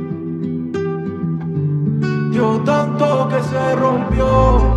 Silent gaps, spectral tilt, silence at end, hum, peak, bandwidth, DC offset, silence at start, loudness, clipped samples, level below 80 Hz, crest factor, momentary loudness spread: none; -8 dB/octave; 0 s; none; 0 dBFS; 9.6 kHz; under 0.1%; 0 s; -17 LUFS; under 0.1%; -24 dBFS; 16 dB; 9 LU